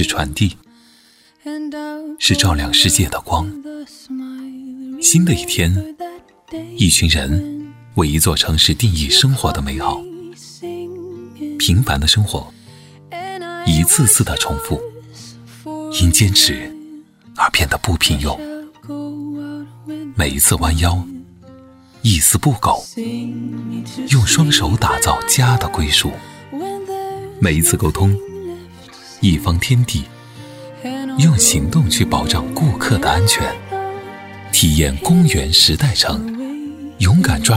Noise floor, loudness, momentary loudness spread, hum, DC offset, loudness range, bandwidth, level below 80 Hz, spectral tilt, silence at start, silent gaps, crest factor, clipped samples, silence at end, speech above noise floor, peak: -51 dBFS; -15 LUFS; 20 LU; none; under 0.1%; 5 LU; 16.5 kHz; -30 dBFS; -3.5 dB/octave; 0 s; none; 16 dB; under 0.1%; 0 s; 36 dB; 0 dBFS